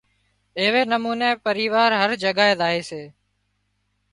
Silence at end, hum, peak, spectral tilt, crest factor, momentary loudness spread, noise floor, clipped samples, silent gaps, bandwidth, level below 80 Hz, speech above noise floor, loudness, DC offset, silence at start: 1.05 s; 50 Hz at -50 dBFS; -2 dBFS; -4 dB/octave; 20 dB; 11 LU; -71 dBFS; under 0.1%; none; 11.5 kHz; -66 dBFS; 50 dB; -20 LUFS; under 0.1%; 0.55 s